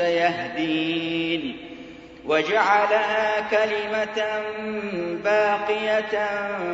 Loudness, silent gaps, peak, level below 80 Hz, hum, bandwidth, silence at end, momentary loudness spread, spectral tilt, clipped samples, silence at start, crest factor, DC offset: -23 LUFS; none; -6 dBFS; -60 dBFS; none; 8 kHz; 0 s; 10 LU; -4.5 dB/octave; under 0.1%; 0 s; 18 dB; under 0.1%